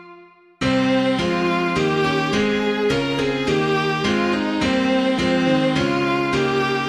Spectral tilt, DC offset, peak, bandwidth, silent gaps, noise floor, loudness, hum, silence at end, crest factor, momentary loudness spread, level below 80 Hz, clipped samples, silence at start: -5.5 dB/octave; under 0.1%; -6 dBFS; 11.5 kHz; none; -46 dBFS; -19 LUFS; none; 0 s; 14 dB; 2 LU; -46 dBFS; under 0.1%; 0 s